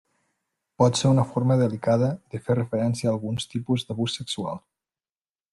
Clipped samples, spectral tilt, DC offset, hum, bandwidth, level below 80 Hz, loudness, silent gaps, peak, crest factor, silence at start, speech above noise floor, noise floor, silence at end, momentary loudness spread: under 0.1%; -6.5 dB/octave; under 0.1%; none; 11.5 kHz; -60 dBFS; -24 LUFS; none; -8 dBFS; 18 dB; 0.8 s; over 66 dB; under -90 dBFS; 0.95 s; 9 LU